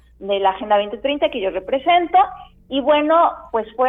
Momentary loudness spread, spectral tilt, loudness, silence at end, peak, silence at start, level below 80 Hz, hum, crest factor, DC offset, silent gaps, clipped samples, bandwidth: 9 LU; -7 dB/octave; -18 LUFS; 0 s; -4 dBFS; 0.2 s; -50 dBFS; none; 14 dB; under 0.1%; none; under 0.1%; 3.9 kHz